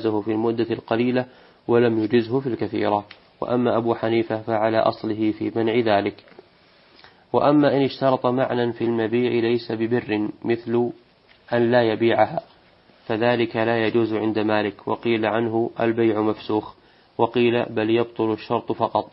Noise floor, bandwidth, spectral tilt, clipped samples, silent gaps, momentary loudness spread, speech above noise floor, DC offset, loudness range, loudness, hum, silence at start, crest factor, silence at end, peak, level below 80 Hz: -55 dBFS; 5.8 kHz; -10.5 dB/octave; under 0.1%; none; 7 LU; 33 dB; under 0.1%; 2 LU; -22 LUFS; none; 0 s; 18 dB; 0.05 s; -4 dBFS; -62 dBFS